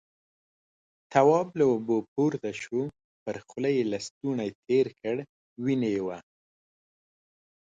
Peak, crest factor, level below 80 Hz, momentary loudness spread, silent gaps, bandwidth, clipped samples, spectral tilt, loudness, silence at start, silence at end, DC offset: -8 dBFS; 20 dB; -70 dBFS; 14 LU; 2.08-2.16 s, 3.04-3.26 s, 4.11-4.21 s, 4.55-4.63 s, 5.29-5.56 s; 9 kHz; under 0.1%; -6.5 dB/octave; -28 LUFS; 1.1 s; 1.55 s; under 0.1%